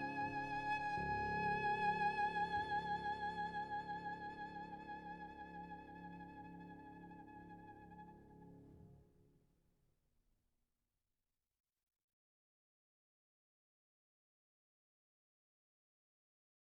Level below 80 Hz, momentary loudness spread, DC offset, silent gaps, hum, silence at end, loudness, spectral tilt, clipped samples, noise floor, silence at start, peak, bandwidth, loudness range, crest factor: -68 dBFS; 20 LU; under 0.1%; none; none; 7.75 s; -43 LUFS; -6 dB/octave; under 0.1%; under -90 dBFS; 0 s; -26 dBFS; 10 kHz; 21 LU; 20 dB